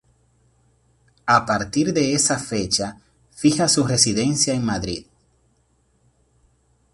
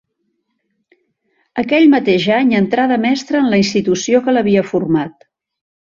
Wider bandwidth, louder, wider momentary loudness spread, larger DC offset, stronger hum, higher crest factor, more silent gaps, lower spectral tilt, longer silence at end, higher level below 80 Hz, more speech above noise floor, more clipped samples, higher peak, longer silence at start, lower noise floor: first, 11.5 kHz vs 7.6 kHz; second, -20 LUFS vs -14 LUFS; first, 10 LU vs 7 LU; neither; neither; first, 22 dB vs 14 dB; neither; second, -3.5 dB/octave vs -5.5 dB/octave; first, 1.9 s vs 0.75 s; about the same, -50 dBFS vs -54 dBFS; second, 44 dB vs 55 dB; neither; about the same, 0 dBFS vs -2 dBFS; second, 1.25 s vs 1.55 s; second, -63 dBFS vs -69 dBFS